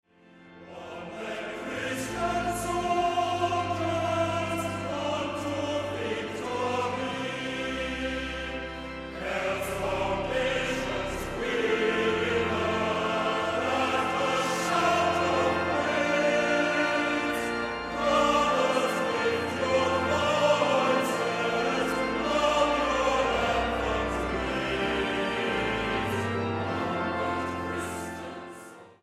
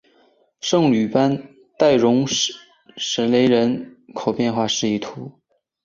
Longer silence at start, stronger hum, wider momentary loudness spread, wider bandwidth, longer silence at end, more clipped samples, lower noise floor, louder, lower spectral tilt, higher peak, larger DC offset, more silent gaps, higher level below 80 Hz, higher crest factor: second, 0.35 s vs 0.65 s; neither; second, 9 LU vs 14 LU; first, 15.5 kHz vs 7.6 kHz; second, 0.1 s vs 0.55 s; neither; second, -54 dBFS vs -58 dBFS; second, -27 LUFS vs -19 LUFS; about the same, -4.5 dB/octave vs -4.5 dB/octave; second, -10 dBFS vs -2 dBFS; neither; neither; first, -48 dBFS vs -60 dBFS; about the same, 18 dB vs 18 dB